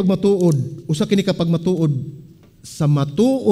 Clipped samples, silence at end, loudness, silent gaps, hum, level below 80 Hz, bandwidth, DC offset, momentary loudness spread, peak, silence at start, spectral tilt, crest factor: under 0.1%; 0 s; -18 LUFS; none; none; -52 dBFS; 13.5 kHz; under 0.1%; 8 LU; -2 dBFS; 0 s; -7.5 dB/octave; 16 dB